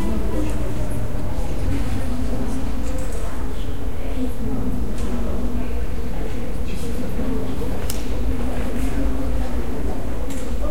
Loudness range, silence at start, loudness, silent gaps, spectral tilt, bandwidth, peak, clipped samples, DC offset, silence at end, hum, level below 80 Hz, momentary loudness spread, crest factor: 1 LU; 0 s; -27 LUFS; none; -6.5 dB/octave; 16.5 kHz; -4 dBFS; under 0.1%; 10%; 0 s; none; -26 dBFS; 4 LU; 18 dB